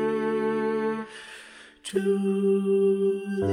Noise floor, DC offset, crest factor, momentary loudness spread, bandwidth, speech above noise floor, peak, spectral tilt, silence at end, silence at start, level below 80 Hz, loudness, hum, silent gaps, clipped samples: -48 dBFS; under 0.1%; 14 dB; 18 LU; 11.5 kHz; 24 dB; -12 dBFS; -7 dB/octave; 0 s; 0 s; -68 dBFS; -25 LUFS; none; none; under 0.1%